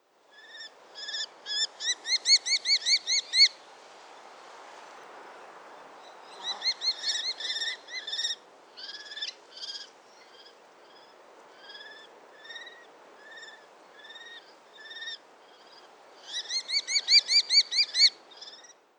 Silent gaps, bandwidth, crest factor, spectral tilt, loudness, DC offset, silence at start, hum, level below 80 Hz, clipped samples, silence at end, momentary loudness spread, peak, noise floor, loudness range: none; 19.5 kHz; 22 dB; 4 dB/octave; -25 LUFS; under 0.1%; 0.45 s; none; under -90 dBFS; under 0.1%; 0.4 s; 27 LU; -10 dBFS; -56 dBFS; 23 LU